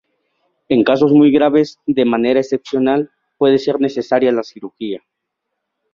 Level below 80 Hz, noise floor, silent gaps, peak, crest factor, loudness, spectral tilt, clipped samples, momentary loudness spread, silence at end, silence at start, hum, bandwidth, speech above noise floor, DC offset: -58 dBFS; -76 dBFS; none; -2 dBFS; 14 dB; -15 LUFS; -7 dB/octave; under 0.1%; 16 LU; 0.95 s; 0.7 s; none; 7.2 kHz; 62 dB; under 0.1%